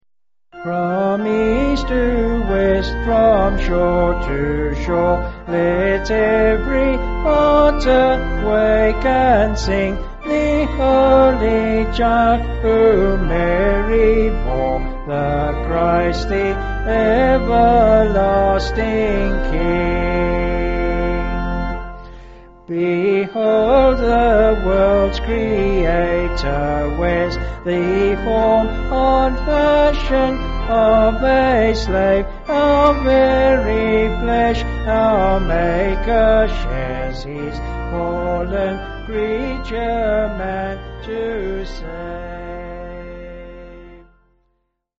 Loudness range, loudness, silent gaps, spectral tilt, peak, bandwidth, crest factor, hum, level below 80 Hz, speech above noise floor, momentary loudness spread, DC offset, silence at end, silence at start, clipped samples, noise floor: 7 LU; -17 LUFS; none; -5 dB/octave; -2 dBFS; 7.8 kHz; 14 dB; none; -24 dBFS; 61 dB; 11 LU; under 0.1%; 1 s; 0.55 s; under 0.1%; -76 dBFS